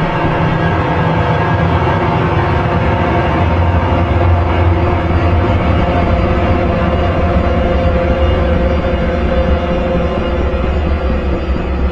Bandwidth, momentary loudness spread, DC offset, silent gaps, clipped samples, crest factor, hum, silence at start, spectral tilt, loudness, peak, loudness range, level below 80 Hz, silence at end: 6.6 kHz; 3 LU; under 0.1%; none; under 0.1%; 12 dB; none; 0 s; -8.5 dB/octave; -14 LUFS; 0 dBFS; 2 LU; -20 dBFS; 0 s